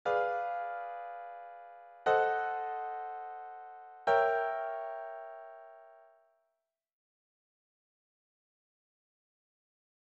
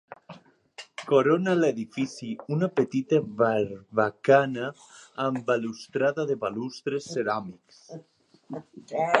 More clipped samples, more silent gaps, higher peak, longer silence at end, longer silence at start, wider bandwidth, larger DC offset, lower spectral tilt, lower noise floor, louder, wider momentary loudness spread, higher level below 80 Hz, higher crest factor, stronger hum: neither; neither; second, -14 dBFS vs -2 dBFS; first, 4 s vs 0 s; about the same, 0.05 s vs 0.1 s; second, 8 kHz vs 11 kHz; neither; second, 0 dB/octave vs -6 dB/octave; first, -85 dBFS vs -50 dBFS; second, -34 LUFS vs -26 LUFS; about the same, 21 LU vs 21 LU; second, -80 dBFS vs -72 dBFS; about the same, 22 dB vs 26 dB; neither